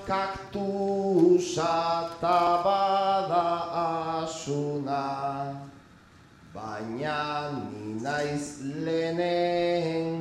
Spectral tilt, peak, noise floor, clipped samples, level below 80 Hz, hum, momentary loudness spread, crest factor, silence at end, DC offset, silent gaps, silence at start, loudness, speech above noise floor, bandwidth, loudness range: -5.5 dB/octave; -10 dBFS; -54 dBFS; under 0.1%; -60 dBFS; none; 12 LU; 18 dB; 0 s; under 0.1%; none; 0 s; -27 LUFS; 27 dB; 12 kHz; 9 LU